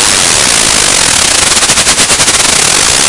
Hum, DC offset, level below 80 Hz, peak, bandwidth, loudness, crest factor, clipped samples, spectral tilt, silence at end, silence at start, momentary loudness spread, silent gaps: none; under 0.1%; -30 dBFS; 0 dBFS; 12 kHz; -4 LUFS; 8 dB; 4%; 0 dB/octave; 0 s; 0 s; 0 LU; none